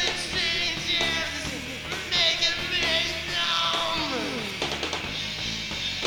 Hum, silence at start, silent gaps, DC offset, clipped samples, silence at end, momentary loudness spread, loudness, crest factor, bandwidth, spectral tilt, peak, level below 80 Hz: none; 0 s; none; under 0.1%; under 0.1%; 0 s; 8 LU; -25 LUFS; 20 dB; over 20 kHz; -2 dB/octave; -8 dBFS; -48 dBFS